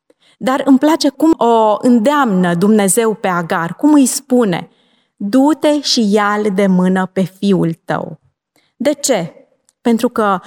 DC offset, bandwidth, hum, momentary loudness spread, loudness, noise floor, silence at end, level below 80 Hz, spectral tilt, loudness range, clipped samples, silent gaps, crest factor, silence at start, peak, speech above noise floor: under 0.1%; 18 kHz; none; 8 LU; -13 LUFS; -60 dBFS; 0.05 s; -62 dBFS; -5 dB/octave; 5 LU; under 0.1%; none; 12 dB; 0.4 s; -2 dBFS; 48 dB